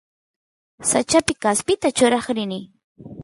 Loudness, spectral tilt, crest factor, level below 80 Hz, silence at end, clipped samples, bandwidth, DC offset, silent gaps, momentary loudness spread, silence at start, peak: -20 LUFS; -3 dB/octave; 18 dB; -54 dBFS; 0 s; under 0.1%; 12 kHz; under 0.1%; 2.84-2.95 s; 8 LU; 0.8 s; -4 dBFS